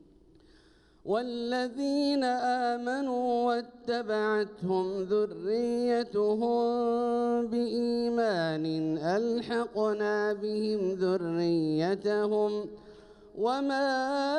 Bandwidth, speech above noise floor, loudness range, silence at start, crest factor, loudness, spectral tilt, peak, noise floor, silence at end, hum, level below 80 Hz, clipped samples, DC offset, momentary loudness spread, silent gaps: 11 kHz; 32 dB; 1 LU; 1.05 s; 12 dB; -29 LUFS; -6 dB/octave; -16 dBFS; -60 dBFS; 0 s; none; -66 dBFS; under 0.1%; under 0.1%; 4 LU; none